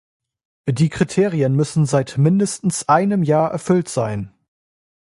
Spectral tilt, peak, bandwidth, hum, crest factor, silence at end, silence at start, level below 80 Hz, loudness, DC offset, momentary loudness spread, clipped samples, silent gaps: -6.5 dB/octave; -2 dBFS; 11.5 kHz; none; 16 dB; 0.8 s; 0.65 s; -52 dBFS; -18 LUFS; under 0.1%; 9 LU; under 0.1%; none